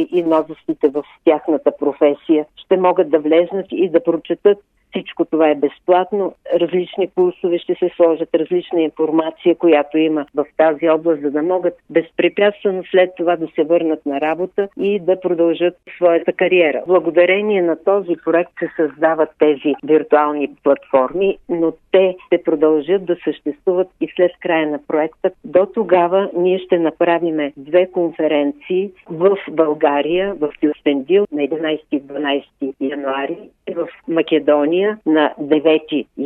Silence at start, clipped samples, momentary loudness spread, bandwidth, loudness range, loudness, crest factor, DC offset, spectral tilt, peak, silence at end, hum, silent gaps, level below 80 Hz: 0 s; under 0.1%; 7 LU; 3.9 kHz; 2 LU; -17 LUFS; 16 dB; under 0.1%; -8.5 dB/octave; 0 dBFS; 0 s; none; none; -60 dBFS